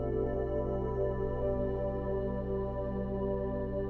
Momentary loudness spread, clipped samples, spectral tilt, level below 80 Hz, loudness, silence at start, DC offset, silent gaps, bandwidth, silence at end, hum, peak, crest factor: 2 LU; under 0.1%; -11 dB/octave; -40 dBFS; -34 LUFS; 0 s; under 0.1%; none; 4.3 kHz; 0 s; none; -20 dBFS; 12 dB